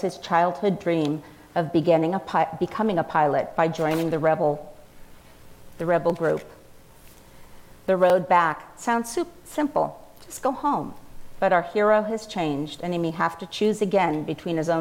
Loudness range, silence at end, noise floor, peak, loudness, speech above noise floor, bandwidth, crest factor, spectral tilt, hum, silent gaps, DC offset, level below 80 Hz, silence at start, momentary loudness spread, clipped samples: 4 LU; 0 s; -48 dBFS; -6 dBFS; -24 LUFS; 25 dB; 17 kHz; 18 dB; -6 dB/octave; none; none; under 0.1%; -56 dBFS; 0 s; 9 LU; under 0.1%